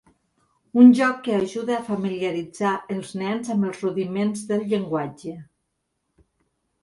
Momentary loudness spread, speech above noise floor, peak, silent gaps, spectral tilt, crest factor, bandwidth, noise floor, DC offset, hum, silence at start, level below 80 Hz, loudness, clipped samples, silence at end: 14 LU; 55 dB; -2 dBFS; none; -6.5 dB/octave; 20 dB; 11.5 kHz; -76 dBFS; under 0.1%; none; 0.75 s; -66 dBFS; -22 LUFS; under 0.1%; 1.4 s